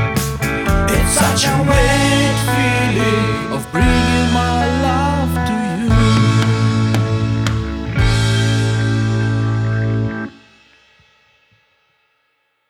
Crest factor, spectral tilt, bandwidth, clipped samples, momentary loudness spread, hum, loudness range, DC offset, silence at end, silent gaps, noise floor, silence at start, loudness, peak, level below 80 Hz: 14 dB; -5 dB/octave; 18 kHz; under 0.1%; 6 LU; none; 6 LU; under 0.1%; 2.4 s; none; -65 dBFS; 0 s; -15 LUFS; -2 dBFS; -26 dBFS